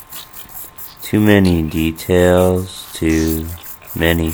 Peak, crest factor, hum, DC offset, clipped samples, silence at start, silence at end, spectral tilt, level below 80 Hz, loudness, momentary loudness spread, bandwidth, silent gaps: 0 dBFS; 16 dB; none; under 0.1%; under 0.1%; 0 s; 0 s; -6 dB/octave; -32 dBFS; -15 LUFS; 18 LU; over 20 kHz; none